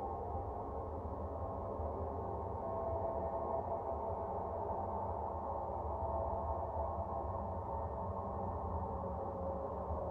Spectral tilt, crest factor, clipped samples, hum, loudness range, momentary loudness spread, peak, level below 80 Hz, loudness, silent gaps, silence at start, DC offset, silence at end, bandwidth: -11 dB/octave; 14 dB; under 0.1%; none; 1 LU; 4 LU; -26 dBFS; -50 dBFS; -41 LUFS; none; 0 s; under 0.1%; 0 s; 3.4 kHz